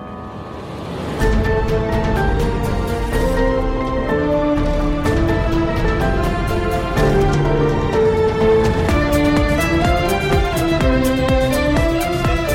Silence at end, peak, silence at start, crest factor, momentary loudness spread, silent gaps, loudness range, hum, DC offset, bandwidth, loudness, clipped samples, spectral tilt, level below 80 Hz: 0 s; -4 dBFS; 0 s; 12 dB; 5 LU; none; 3 LU; none; under 0.1%; 16.5 kHz; -17 LUFS; under 0.1%; -6.5 dB/octave; -22 dBFS